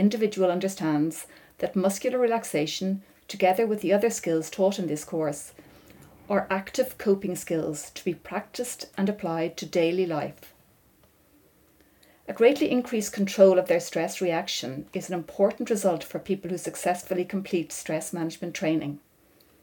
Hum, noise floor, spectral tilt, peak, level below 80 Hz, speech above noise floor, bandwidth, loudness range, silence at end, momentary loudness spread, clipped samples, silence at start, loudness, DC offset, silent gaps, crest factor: none; -61 dBFS; -5 dB/octave; -6 dBFS; -66 dBFS; 35 dB; 18 kHz; 6 LU; 0.65 s; 10 LU; under 0.1%; 0 s; -27 LUFS; under 0.1%; none; 22 dB